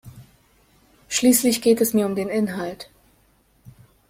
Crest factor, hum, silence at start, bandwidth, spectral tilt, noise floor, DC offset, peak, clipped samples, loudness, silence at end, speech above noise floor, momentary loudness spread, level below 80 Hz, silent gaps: 20 dB; none; 0.05 s; 16.5 kHz; -4 dB/octave; -60 dBFS; under 0.1%; -4 dBFS; under 0.1%; -20 LUFS; 0.4 s; 40 dB; 16 LU; -58 dBFS; none